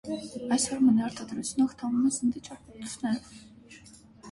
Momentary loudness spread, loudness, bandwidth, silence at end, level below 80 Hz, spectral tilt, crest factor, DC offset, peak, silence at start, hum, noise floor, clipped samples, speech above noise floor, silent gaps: 16 LU; -28 LUFS; 11.5 kHz; 0 s; -62 dBFS; -4 dB/octave; 16 dB; under 0.1%; -14 dBFS; 0.05 s; none; -53 dBFS; under 0.1%; 24 dB; none